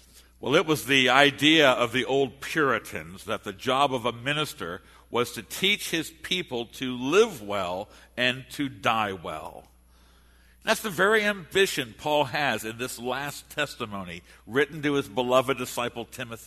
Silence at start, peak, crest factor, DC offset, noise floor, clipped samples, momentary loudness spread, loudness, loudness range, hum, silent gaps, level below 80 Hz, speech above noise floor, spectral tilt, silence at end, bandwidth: 0.4 s; -2 dBFS; 24 dB; under 0.1%; -57 dBFS; under 0.1%; 16 LU; -25 LUFS; 6 LU; none; none; -58 dBFS; 31 dB; -3.5 dB/octave; 0 s; 13.5 kHz